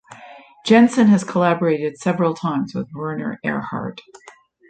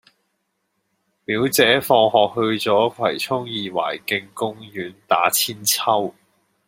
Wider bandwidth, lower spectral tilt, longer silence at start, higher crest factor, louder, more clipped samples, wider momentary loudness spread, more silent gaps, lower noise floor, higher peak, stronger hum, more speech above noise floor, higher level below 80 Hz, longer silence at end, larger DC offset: second, 9.2 kHz vs 16.5 kHz; first, -6.5 dB/octave vs -3 dB/octave; second, 0.1 s vs 1.3 s; about the same, 18 dB vs 20 dB; about the same, -19 LUFS vs -19 LUFS; neither; about the same, 14 LU vs 12 LU; neither; second, -43 dBFS vs -73 dBFS; about the same, -2 dBFS vs 0 dBFS; neither; second, 25 dB vs 53 dB; about the same, -60 dBFS vs -64 dBFS; second, 0.4 s vs 0.55 s; neither